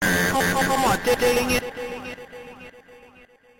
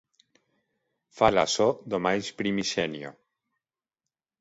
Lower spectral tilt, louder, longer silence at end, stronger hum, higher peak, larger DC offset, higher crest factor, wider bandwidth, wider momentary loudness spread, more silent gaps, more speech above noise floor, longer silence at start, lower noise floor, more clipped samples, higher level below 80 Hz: about the same, -3.5 dB/octave vs -4 dB/octave; first, -21 LUFS vs -26 LUFS; second, 0.65 s vs 1.3 s; neither; about the same, -8 dBFS vs -6 dBFS; neither; second, 16 dB vs 24 dB; first, 16.5 kHz vs 8 kHz; first, 20 LU vs 10 LU; neither; second, 31 dB vs 64 dB; second, 0 s vs 1.15 s; second, -52 dBFS vs -89 dBFS; neither; first, -44 dBFS vs -58 dBFS